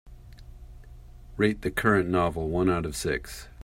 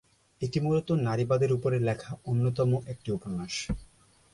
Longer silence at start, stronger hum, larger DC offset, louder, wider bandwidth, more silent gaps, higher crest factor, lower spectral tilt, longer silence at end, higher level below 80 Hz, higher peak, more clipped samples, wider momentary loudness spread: second, 0.05 s vs 0.4 s; neither; neither; first, -26 LUFS vs -29 LUFS; first, 16 kHz vs 11.5 kHz; neither; first, 22 dB vs 14 dB; second, -5.5 dB/octave vs -7 dB/octave; second, 0 s vs 0.5 s; first, -44 dBFS vs -50 dBFS; first, -8 dBFS vs -14 dBFS; neither; about the same, 9 LU vs 9 LU